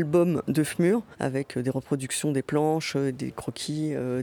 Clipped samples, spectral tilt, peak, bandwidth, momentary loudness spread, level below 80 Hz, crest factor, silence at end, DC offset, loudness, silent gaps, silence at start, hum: under 0.1%; -5.5 dB/octave; -12 dBFS; 19 kHz; 7 LU; -62 dBFS; 14 dB; 0 s; under 0.1%; -27 LUFS; none; 0 s; none